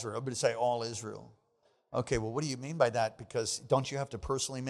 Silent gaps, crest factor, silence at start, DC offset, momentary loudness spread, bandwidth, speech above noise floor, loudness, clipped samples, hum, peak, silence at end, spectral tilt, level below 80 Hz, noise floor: none; 22 dB; 0 s; under 0.1%; 9 LU; 13.5 kHz; 39 dB; -33 LUFS; under 0.1%; none; -12 dBFS; 0 s; -4.5 dB/octave; -56 dBFS; -73 dBFS